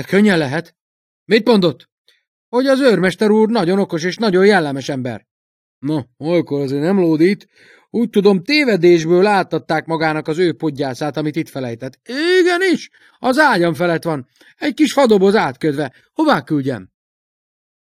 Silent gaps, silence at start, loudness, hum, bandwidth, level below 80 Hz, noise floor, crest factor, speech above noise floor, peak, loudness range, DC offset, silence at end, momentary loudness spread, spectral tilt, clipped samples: 0.81-1.26 s, 1.92-2.05 s, 2.27-2.52 s, 5.31-5.81 s; 0 s; -16 LUFS; none; 15 kHz; -60 dBFS; under -90 dBFS; 16 dB; over 75 dB; 0 dBFS; 3 LU; under 0.1%; 1.15 s; 12 LU; -6 dB/octave; under 0.1%